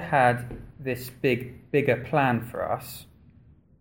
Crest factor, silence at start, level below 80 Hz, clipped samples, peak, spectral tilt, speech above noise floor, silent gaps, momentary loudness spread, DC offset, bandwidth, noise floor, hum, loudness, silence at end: 20 dB; 0 s; -54 dBFS; under 0.1%; -8 dBFS; -6.5 dB/octave; 30 dB; none; 14 LU; under 0.1%; 17 kHz; -55 dBFS; none; -26 LUFS; 0.8 s